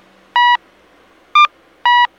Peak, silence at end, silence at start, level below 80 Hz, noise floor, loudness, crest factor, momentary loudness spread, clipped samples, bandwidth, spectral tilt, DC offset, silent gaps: 0 dBFS; 0.1 s; 0.35 s; -68 dBFS; -49 dBFS; -13 LUFS; 14 dB; 7 LU; under 0.1%; 7.6 kHz; 2 dB/octave; under 0.1%; none